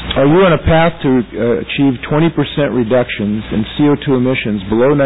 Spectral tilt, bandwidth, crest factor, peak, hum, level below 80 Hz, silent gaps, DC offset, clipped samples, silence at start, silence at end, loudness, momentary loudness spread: -11 dB/octave; 4 kHz; 10 dB; -2 dBFS; none; -32 dBFS; none; 1%; under 0.1%; 0 s; 0 s; -13 LUFS; 7 LU